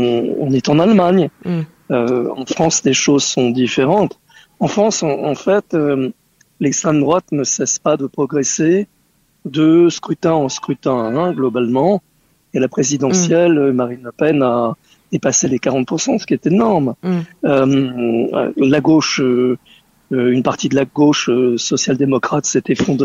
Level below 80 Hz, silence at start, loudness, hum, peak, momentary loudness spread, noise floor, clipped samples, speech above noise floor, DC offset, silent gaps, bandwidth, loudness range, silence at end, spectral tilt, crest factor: -54 dBFS; 0 s; -15 LUFS; none; -2 dBFS; 8 LU; -58 dBFS; under 0.1%; 43 dB; under 0.1%; none; 8 kHz; 2 LU; 0 s; -4.5 dB/octave; 14 dB